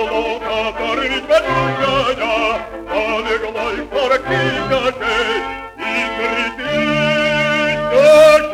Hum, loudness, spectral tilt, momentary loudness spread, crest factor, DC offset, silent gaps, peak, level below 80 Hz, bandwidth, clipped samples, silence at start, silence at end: none; -16 LUFS; -4.5 dB/octave; 8 LU; 16 dB; under 0.1%; none; 0 dBFS; -40 dBFS; 14.5 kHz; under 0.1%; 0 s; 0 s